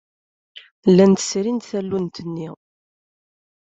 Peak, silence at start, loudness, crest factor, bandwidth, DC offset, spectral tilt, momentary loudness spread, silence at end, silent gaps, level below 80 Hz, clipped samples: -2 dBFS; 0.55 s; -19 LUFS; 18 dB; 8 kHz; under 0.1%; -6 dB/octave; 17 LU; 1.1 s; 0.71-0.83 s; -62 dBFS; under 0.1%